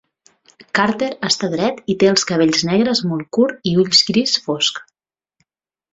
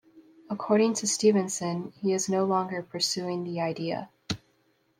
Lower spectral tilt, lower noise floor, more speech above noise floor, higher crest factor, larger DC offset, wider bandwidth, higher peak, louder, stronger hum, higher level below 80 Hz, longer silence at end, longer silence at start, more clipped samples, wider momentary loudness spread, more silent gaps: about the same, -4 dB/octave vs -4 dB/octave; first, -87 dBFS vs -69 dBFS; first, 70 dB vs 42 dB; about the same, 16 dB vs 18 dB; neither; second, 8.4 kHz vs 15.5 kHz; first, -2 dBFS vs -10 dBFS; first, -16 LUFS vs -28 LUFS; neither; first, -56 dBFS vs -66 dBFS; first, 1.1 s vs 0.6 s; first, 0.75 s vs 0.15 s; neither; second, 8 LU vs 13 LU; neither